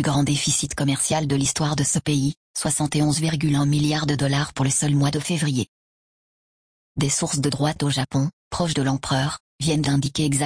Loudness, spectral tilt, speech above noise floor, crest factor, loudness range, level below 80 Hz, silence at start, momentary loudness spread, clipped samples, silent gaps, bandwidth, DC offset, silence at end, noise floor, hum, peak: -22 LUFS; -4.5 dB/octave; over 68 dB; 14 dB; 3 LU; -48 dBFS; 0 s; 6 LU; under 0.1%; 2.37-2.54 s, 5.68-6.95 s, 8.33-8.51 s, 9.40-9.59 s; 10.5 kHz; under 0.1%; 0 s; under -90 dBFS; none; -8 dBFS